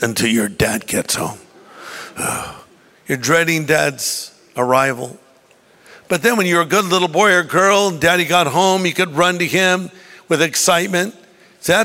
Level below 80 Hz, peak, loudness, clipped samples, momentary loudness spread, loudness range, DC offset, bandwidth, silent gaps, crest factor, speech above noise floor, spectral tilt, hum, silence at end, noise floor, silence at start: -50 dBFS; -2 dBFS; -16 LUFS; under 0.1%; 13 LU; 5 LU; under 0.1%; 16.5 kHz; none; 16 dB; 35 dB; -3 dB/octave; none; 0 s; -51 dBFS; 0 s